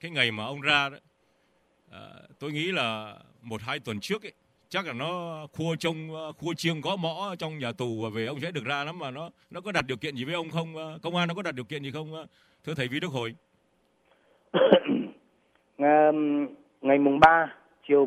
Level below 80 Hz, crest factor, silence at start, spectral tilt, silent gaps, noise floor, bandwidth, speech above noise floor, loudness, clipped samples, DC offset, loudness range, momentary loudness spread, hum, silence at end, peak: -64 dBFS; 26 dB; 0.05 s; -5.5 dB/octave; none; -69 dBFS; 14.5 kHz; 41 dB; -28 LUFS; under 0.1%; under 0.1%; 9 LU; 17 LU; none; 0 s; -4 dBFS